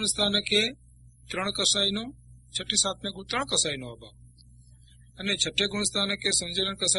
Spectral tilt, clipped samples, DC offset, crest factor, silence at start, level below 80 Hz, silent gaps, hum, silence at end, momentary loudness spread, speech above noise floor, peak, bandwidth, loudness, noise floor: -1.5 dB/octave; under 0.1%; under 0.1%; 20 dB; 0 s; -54 dBFS; none; none; 0 s; 13 LU; 26 dB; -8 dBFS; 11.5 kHz; -26 LUFS; -54 dBFS